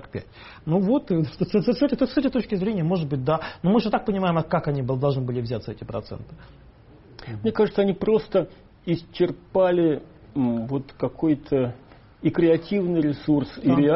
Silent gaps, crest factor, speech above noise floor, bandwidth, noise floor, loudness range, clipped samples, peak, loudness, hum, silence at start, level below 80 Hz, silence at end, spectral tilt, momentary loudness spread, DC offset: none; 14 dB; 26 dB; 5.8 kHz; -49 dBFS; 4 LU; under 0.1%; -8 dBFS; -24 LUFS; none; 0 s; -50 dBFS; 0 s; -7 dB/octave; 12 LU; under 0.1%